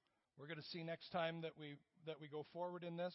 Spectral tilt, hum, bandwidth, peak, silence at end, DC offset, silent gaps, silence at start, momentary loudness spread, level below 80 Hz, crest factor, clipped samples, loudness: -4 dB/octave; none; 5.6 kHz; -30 dBFS; 0 s; under 0.1%; none; 0.35 s; 12 LU; under -90 dBFS; 20 dB; under 0.1%; -49 LUFS